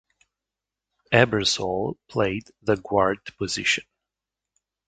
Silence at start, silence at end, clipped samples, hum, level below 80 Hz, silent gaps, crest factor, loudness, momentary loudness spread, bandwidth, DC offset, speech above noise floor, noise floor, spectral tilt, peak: 1.1 s; 1.05 s; under 0.1%; none; -54 dBFS; none; 26 dB; -24 LUFS; 9 LU; 9.6 kHz; under 0.1%; 64 dB; -88 dBFS; -4 dB/octave; 0 dBFS